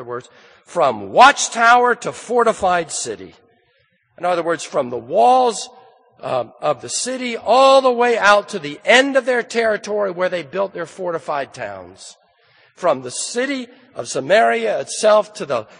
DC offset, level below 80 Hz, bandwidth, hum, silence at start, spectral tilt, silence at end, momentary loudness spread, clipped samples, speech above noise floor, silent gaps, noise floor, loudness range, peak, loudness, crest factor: under 0.1%; -60 dBFS; 10 kHz; none; 0 s; -2.5 dB/octave; 0.15 s; 16 LU; under 0.1%; 44 dB; none; -61 dBFS; 9 LU; 0 dBFS; -17 LUFS; 18 dB